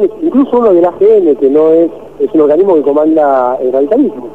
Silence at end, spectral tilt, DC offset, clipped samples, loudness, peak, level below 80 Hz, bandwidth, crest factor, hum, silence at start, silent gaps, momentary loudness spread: 0 s; -9 dB/octave; 0.9%; under 0.1%; -9 LUFS; 0 dBFS; -48 dBFS; 4 kHz; 8 dB; none; 0 s; none; 4 LU